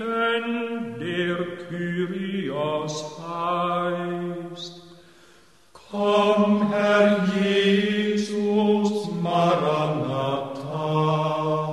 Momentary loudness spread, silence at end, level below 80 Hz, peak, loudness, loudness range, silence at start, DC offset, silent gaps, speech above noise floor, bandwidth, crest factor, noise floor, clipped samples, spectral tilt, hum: 11 LU; 0 s; -66 dBFS; -6 dBFS; -23 LUFS; 7 LU; 0 s; 0.1%; none; 28 dB; 12 kHz; 18 dB; -55 dBFS; under 0.1%; -6 dB/octave; none